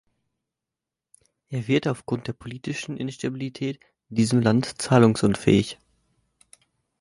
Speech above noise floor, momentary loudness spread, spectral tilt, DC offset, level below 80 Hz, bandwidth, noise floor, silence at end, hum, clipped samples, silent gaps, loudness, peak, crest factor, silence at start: 65 dB; 15 LU; -6 dB/octave; under 0.1%; -56 dBFS; 11.5 kHz; -88 dBFS; 1.3 s; none; under 0.1%; none; -24 LUFS; -4 dBFS; 22 dB; 1.5 s